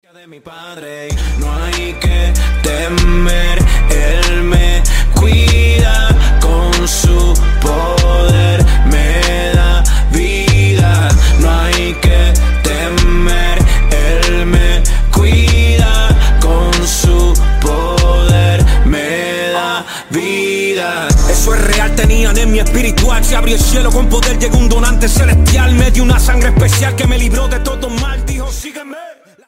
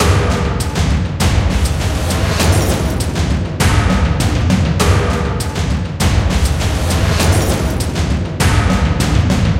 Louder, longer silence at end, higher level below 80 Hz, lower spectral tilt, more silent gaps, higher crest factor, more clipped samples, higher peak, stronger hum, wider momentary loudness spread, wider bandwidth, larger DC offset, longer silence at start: first, -12 LUFS vs -15 LUFS; first, 0.35 s vs 0 s; first, -10 dBFS vs -20 dBFS; about the same, -4.5 dB/octave vs -5 dB/octave; neither; about the same, 10 dB vs 14 dB; neither; about the same, 0 dBFS vs 0 dBFS; neither; first, 8 LU vs 4 LU; about the same, 16.5 kHz vs 16.5 kHz; neither; first, 0.45 s vs 0 s